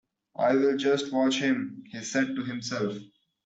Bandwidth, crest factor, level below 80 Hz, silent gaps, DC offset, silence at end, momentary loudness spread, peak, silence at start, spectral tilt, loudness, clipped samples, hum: 8 kHz; 16 dB; -72 dBFS; none; under 0.1%; 0.4 s; 13 LU; -12 dBFS; 0.4 s; -4.5 dB/octave; -27 LUFS; under 0.1%; none